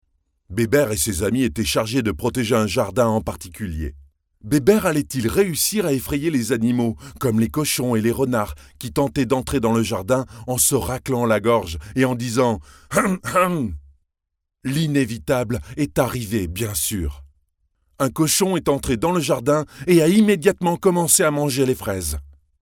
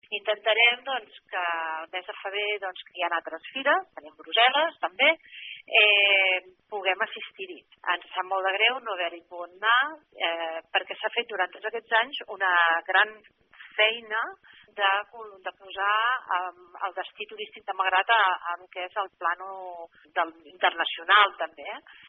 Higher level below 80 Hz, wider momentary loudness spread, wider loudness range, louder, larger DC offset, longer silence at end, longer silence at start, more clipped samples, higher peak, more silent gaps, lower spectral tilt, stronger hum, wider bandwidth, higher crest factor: first, -42 dBFS vs -82 dBFS; second, 9 LU vs 18 LU; about the same, 5 LU vs 6 LU; first, -20 LUFS vs -25 LUFS; neither; first, 0.35 s vs 0.15 s; first, 0.5 s vs 0.1 s; neither; first, -2 dBFS vs -6 dBFS; neither; first, -4.5 dB/octave vs 4.5 dB/octave; neither; first, 19.5 kHz vs 5.2 kHz; about the same, 18 dB vs 22 dB